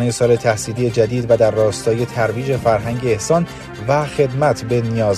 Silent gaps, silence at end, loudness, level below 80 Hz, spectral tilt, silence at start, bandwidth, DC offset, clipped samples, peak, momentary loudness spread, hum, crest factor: none; 0 s; -17 LUFS; -44 dBFS; -6 dB/octave; 0 s; 13.5 kHz; under 0.1%; under 0.1%; 0 dBFS; 5 LU; none; 16 dB